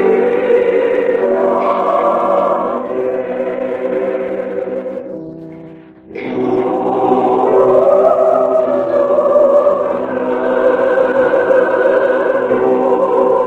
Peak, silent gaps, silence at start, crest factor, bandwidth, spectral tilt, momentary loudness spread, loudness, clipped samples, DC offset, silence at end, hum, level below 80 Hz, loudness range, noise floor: 0 dBFS; none; 0 s; 14 dB; 7.4 kHz; -7.5 dB/octave; 11 LU; -13 LUFS; under 0.1%; under 0.1%; 0 s; none; -54 dBFS; 8 LU; -35 dBFS